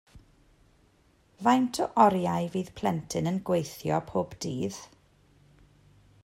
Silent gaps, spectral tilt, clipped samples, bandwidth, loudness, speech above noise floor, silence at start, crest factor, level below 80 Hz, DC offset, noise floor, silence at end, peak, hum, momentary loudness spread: none; -6 dB/octave; under 0.1%; 16 kHz; -28 LUFS; 37 dB; 0.15 s; 24 dB; -62 dBFS; under 0.1%; -64 dBFS; 1.4 s; -6 dBFS; none; 11 LU